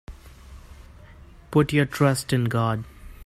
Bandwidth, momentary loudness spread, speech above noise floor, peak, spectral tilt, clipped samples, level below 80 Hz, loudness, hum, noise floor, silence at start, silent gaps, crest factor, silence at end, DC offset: 14.5 kHz; 8 LU; 25 dB; -6 dBFS; -6 dB/octave; under 0.1%; -46 dBFS; -23 LUFS; none; -47 dBFS; 0.1 s; none; 20 dB; 0 s; under 0.1%